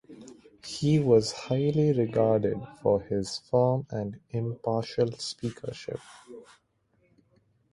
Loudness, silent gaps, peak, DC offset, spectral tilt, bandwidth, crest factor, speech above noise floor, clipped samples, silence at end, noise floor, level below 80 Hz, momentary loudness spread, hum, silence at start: -28 LUFS; none; -10 dBFS; under 0.1%; -6.5 dB/octave; 11.5 kHz; 20 dB; 43 dB; under 0.1%; 1.3 s; -70 dBFS; -60 dBFS; 17 LU; none; 0.1 s